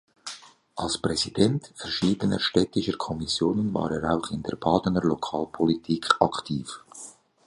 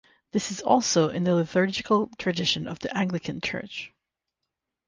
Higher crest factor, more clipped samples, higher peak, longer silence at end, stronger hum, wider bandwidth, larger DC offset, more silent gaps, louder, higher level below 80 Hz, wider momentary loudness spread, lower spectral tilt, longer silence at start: about the same, 24 dB vs 20 dB; neither; first, -2 dBFS vs -6 dBFS; second, 0.35 s vs 1 s; neither; first, 11.5 kHz vs 10 kHz; neither; neither; about the same, -26 LUFS vs -25 LUFS; first, -52 dBFS vs -60 dBFS; first, 16 LU vs 9 LU; about the same, -5 dB/octave vs -4.5 dB/octave; about the same, 0.25 s vs 0.35 s